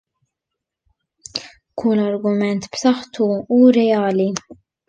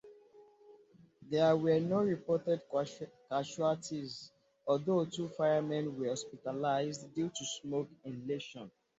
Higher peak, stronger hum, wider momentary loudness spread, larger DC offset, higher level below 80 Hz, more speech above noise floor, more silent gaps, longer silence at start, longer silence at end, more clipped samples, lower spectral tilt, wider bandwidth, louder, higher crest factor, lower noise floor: first, -2 dBFS vs -18 dBFS; neither; about the same, 16 LU vs 14 LU; neither; first, -60 dBFS vs -76 dBFS; first, 66 dB vs 28 dB; neither; first, 1.35 s vs 0.05 s; about the same, 0.35 s vs 0.3 s; neither; about the same, -5.5 dB/octave vs -5.5 dB/octave; about the same, 8.8 kHz vs 8.2 kHz; first, -17 LUFS vs -35 LUFS; about the same, 16 dB vs 18 dB; first, -82 dBFS vs -63 dBFS